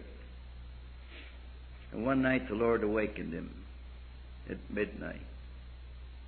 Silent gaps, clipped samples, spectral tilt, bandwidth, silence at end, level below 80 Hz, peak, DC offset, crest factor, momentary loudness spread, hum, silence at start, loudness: none; under 0.1%; -5.5 dB/octave; 4.5 kHz; 0 s; -48 dBFS; -18 dBFS; under 0.1%; 20 dB; 21 LU; none; 0 s; -34 LUFS